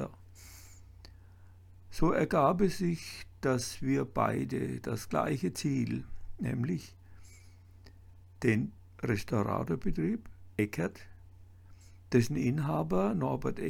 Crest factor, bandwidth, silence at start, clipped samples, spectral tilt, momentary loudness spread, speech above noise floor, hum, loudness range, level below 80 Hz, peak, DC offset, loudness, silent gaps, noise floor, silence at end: 20 dB; 17.5 kHz; 0 s; under 0.1%; -6.5 dB/octave; 15 LU; 24 dB; none; 5 LU; -50 dBFS; -14 dBFS; under 0.1%; -32 LUFS; none; -55 dBFS; 0 s